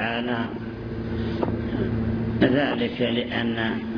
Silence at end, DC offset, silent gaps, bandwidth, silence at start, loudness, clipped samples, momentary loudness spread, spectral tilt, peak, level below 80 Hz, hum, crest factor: 0 s; under 0.1%; none; 5.4 kHz; 0 s; -25 LUFS; under 0.1%; 10 LU; -8.5 dB/octave; -6 dBFS; -40 dBFS; none; 20 dB